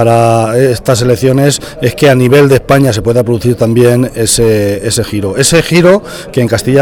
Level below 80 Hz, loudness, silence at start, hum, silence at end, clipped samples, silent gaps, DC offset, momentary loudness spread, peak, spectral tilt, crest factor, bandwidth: -32 dBFS; -9 LUFS; 0 s; none; 0 s; 0.7%; none; under 0.1%; 6 LU; 0 dBFS; -5 dB/octave; 8 dB; 18.5 kHz